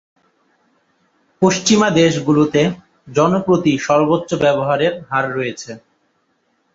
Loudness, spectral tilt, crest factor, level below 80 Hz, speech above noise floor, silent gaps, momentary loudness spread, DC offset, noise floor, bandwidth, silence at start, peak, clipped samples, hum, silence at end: -16 LUFS; -5 dB/octave; 16 dB; -54 dBFS; 49 dB; none; 11 LU; under 0.1%; -64 dBFS; 7.8 kHz; 1.4 s; -2 dBFS; under 0.1%; none; 0.95 s